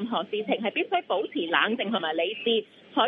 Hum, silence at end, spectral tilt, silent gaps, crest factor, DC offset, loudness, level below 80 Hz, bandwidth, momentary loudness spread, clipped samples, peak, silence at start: none; 0 s; -7 dB/octave; none; 20 dB; under 0.1%; -27 LUFS; -80 dBFS; 4.6 kHz; 5 LU; under 0.1%; -6 dBFS; 0 s